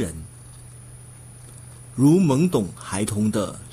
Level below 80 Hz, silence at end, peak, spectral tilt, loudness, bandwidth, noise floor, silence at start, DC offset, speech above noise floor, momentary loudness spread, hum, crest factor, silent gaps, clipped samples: -50 dBFS; 0 s; -6 dBFS; -6.5 dB/octave; -21 LUFS; 15.5 kHz; -43 dBFS; 0 s; under 0.1%; 22 dB; 25 LU; none; 16 dB; none; under 0.1%